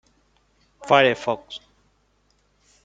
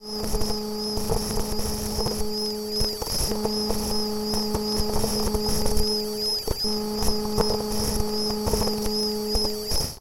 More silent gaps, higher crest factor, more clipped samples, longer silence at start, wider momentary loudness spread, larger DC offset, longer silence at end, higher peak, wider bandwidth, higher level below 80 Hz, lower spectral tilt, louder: neither; first, 24 dB vs 18 dB; neither; first, 0.8 s vs 0 s; first, 22 LU vs 3 LU; neither; first, 1.25 s vs 0 s; first, -2 dBFS vs -6 dBFS; second, 9 kHz vs 17 kHz; second, -64 dBFS vs -34 dBFS; about the same, -4.5 dB/octave vs -4 dB/octave; first, -20 LUFS vs -26 LUFS